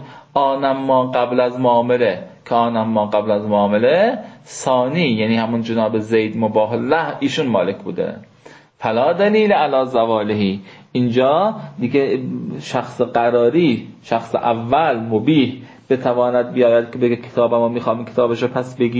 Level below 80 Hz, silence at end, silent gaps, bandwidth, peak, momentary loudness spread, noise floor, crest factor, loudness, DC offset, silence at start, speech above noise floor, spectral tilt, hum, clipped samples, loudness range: -58 dBFS; 0 s; none; 8 kHz; -2 dBFS; 9 LU; -45 dBFS; 14 dB; -17 LUFS; under 0.1%; 0 s; 28 dB; -6.5 dB/octave; none; under 0.1%; 2 LU